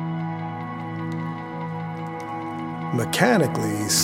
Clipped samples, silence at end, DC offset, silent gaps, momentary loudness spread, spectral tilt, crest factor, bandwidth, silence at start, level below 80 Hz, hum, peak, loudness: under 0.1%; 0 s; under 0.1%; none; 12 LU; -4 dB/octave; 22 dB; 16.5 kHz; 0 s; -60 dBFS; none; -4 dBFS; -25 LUFS